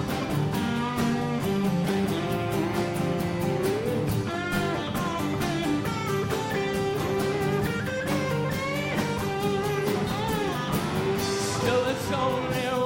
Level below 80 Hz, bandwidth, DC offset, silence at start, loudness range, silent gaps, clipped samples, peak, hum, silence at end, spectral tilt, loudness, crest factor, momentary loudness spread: -48 dBFS; 16.5 kHz; under 0.1%; 0 s; 1 LU; none; under 0.1%; -12 dBFS; none; 0 s; -5.5 dB/octave; -27 LUFS; 16 dB; 2 LU